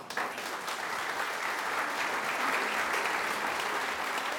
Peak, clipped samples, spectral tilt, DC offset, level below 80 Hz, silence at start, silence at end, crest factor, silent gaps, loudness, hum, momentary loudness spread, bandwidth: -16 dBFS; under 0.1%; -1 dB/octave; under 0.1%; -72 dBFS; 0 s; 0 s; 16 dB; none; -31 LUFS; none; 5 LU; over 20 kHz